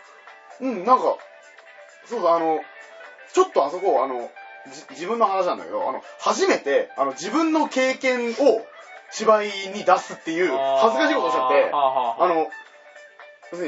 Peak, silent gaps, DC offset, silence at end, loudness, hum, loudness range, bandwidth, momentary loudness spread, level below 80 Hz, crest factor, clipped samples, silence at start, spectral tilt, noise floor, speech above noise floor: 0 dBFS; none; under 0.1%; 0 s; -22 LUFS; none; 4 LU; 8 kHz; 18 LU; -80 dBFS; 22 dB; under 0.1%; 0.25 s; -3.5 dB/octave; -47 dBFS; 26 dB